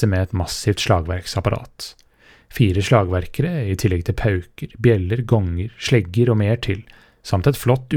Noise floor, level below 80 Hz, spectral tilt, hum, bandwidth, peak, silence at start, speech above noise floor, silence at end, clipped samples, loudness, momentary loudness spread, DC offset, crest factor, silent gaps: -49 dBFS; -40 dBFS; -6.5 dB/octave; none; 17.5 kHz; -2 dBFS; 0 s; 30 dB; 0 s; under 0.1%; -20 LUFS; 10 LU; under 0.1%; 18 dB; none